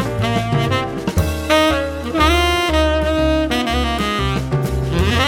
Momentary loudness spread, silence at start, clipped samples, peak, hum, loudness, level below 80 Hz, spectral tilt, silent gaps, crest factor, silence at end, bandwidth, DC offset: 6 LU; 0 s; under 0.1%; 0 dBFS; none; -17 LUFS; -26 dBFS; -5.5 dB/octave; none; 16 dB; 0 s; 18 kHz; under 0.1%